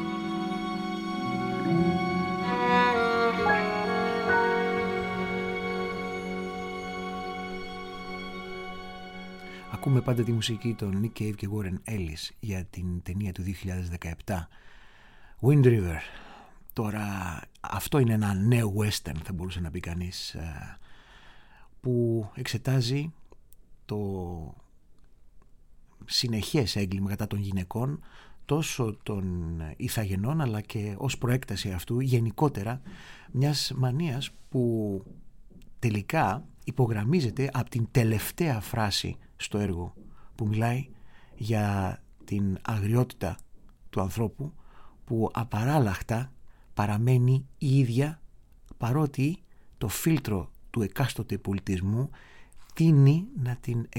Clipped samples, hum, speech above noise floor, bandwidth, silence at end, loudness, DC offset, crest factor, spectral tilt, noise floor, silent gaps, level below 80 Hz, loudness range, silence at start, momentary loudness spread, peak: under 0.1%; none; 25 dB; 17 kHz; 0 s; -29 LUFS; under 0.1%; 20 dB; -6 dB/octave; -52 dBFS; none; -50 dBFS; 7 LU; 0 s; 13 LU; -8 dBFS